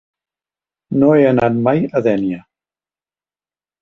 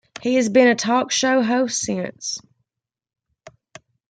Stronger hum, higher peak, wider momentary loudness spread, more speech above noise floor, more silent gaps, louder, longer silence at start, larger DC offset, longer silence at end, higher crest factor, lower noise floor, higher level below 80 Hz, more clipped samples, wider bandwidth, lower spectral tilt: first, 50 Hz at -45 dBFS vs none; about the same, -2 dBFS vs -2 dBFS; about the same, 11 LU vs 13 LU; first, over 76 dB vs 68 dB; neither; first, -15 LUFS vs -19 LUFS; first, 0.9 s vs 0.2 s; neither; first, 1.4 s vs 0.6 s; about the same, 16 dB vs 18 dB; about the same, under -90 dBFS vs -87 dBFS; first, -52 dBFS vs -66 dBFS; neither; second, 6.4 kHz vs 9.4 kHz; first, -9.5 dB/octave vs -3 dB/octave